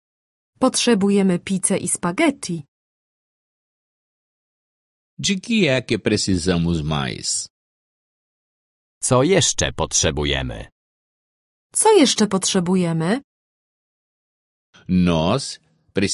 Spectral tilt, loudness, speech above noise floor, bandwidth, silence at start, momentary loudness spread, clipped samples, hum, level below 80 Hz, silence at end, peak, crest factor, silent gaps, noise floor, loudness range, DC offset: -4 dB/octave; -19 LUFS; over 71 dB; 11.5 kHz; 0.6 s; 10 LU; under 0.1%; none; -42 dBFS; 0 s; -4 dBFS; 18 dB; 2.68-5.17 s, 7.50-9.01 s, 10.72-11.70 s, 13.24-14.73 s; under -90 dBFS; 6 LU; under 0.1%